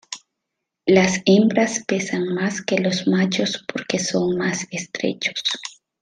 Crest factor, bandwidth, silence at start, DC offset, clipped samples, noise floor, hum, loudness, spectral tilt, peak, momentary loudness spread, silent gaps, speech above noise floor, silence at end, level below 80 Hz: 18 dB; 9.8 kHz; 0.1 s; under 0.1%; under 0.1%; -81 dBFS; none; -20 LUFS; -4.5 dB/octave; -2 dBFS; 12 LU; none; 61 dB; 0.3 s; -62 dBFS